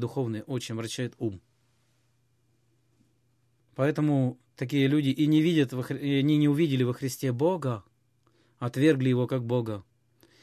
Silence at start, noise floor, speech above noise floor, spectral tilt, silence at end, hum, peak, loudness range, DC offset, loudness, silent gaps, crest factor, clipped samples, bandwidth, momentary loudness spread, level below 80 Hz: 0 s; -70 dBFS; 44 dB; -7 dB/octave; 0.6 s; none; -10 dBFS; 11 LU; under 0.1%; -27 LUFS; none; 18 dB; under 0.1%; 14.5 kHz; 12 LU; -68 dBFS